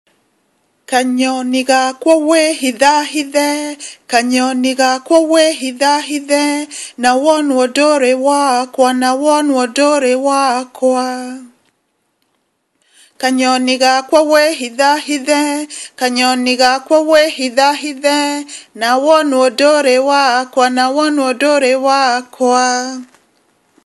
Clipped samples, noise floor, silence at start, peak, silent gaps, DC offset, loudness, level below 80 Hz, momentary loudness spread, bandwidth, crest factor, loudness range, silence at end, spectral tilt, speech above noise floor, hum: under 0.1%; -65 dBFS; 0.9 s; 0 dBFS; none; under 0.1%; -12 LUFS; -64 dBFS; 7 LU; 12.5 kHz; 14 dB; 3 LU; 0.8 s; -1 dB/octave; 52 dB; none